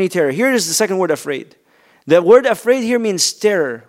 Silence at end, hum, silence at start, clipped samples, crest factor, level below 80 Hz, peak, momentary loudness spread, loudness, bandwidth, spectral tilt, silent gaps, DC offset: 0.1 s; none; 0 s; under 0.1%; 16 dB; -68 dBFS; 0 dBFS; 8 LU; -15 LUFS; 16 kHz; -3.5 dB/octave; none; under 0.1%